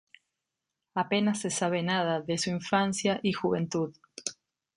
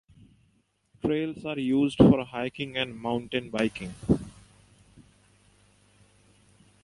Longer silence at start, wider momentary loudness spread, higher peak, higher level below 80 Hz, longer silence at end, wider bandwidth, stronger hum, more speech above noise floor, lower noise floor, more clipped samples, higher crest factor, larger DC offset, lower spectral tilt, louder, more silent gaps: about the same, 0.95 s vs 1.05 s; second, 10 LU vs 13 LU; second, -12 dBFS vs -4 dBFS; second, -68 dBFS vs -50 dBFS; second, 0.45 s vs 2.5 s; about the same, 11 kHz vs 11.5 kHz; second, none vs 50 Hz at -50 dBFS; first, 58 dB vs 43 dB; first, -86 dBFS vs -69 dBFS; neither; about the same, 20 dB vs 24 dB; neither; second, -4.5 dB/octave vs -7 dB/octave; about the same, -29 LUFS vs -27 LUFS; neither